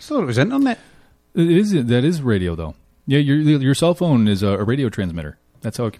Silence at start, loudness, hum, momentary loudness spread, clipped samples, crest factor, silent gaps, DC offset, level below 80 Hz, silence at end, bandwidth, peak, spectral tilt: 0 s; -18 LUFS; none; 14 LU; under 0.1%; 14 dB; none; under 0.1%; -44 dBFS; 0.1 s; 14.5 kHz; -4 dBFS; -7 dB/octave